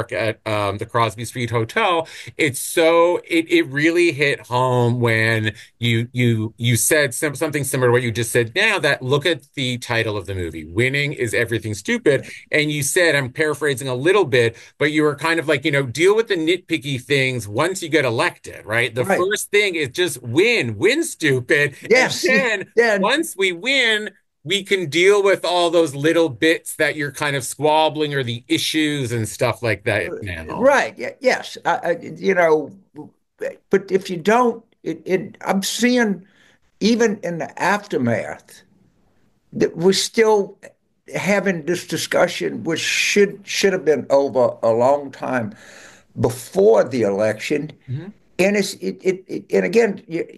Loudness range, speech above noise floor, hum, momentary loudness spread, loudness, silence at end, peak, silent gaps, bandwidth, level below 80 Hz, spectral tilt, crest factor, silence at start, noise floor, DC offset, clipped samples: 4 LU; 43 dB; none; 8 LU; -19 LUFS; 0.05 s; -4 dBFS; none; 13 kHz; -58 dBFS; -4.5 dB/octave; 16 dB; 0 s; -62 dBFS; under 0.1%; under 0.1%